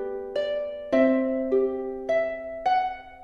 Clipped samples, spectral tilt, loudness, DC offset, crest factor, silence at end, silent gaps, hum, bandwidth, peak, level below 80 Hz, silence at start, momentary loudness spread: under 0.1%; -6 dB/octave; -26 LUFS; under 0.1%; 18 dB; 0 s; none; none; 6.8 kHz; -8 dBFS; -56 dBFS; 0 s; 9 LU